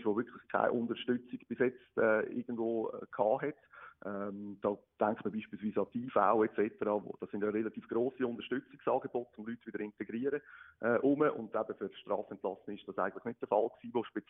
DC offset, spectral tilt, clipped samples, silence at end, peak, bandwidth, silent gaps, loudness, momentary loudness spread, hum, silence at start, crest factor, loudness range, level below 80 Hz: under 0.1%; -2 dB/octave; under 0.1%; 0.1 s; -14 dBFS; 3.8 kHz; none; -36 LUFS; 12 LU; none; 0 s; 20 dB; 3 LU; -76 dBFS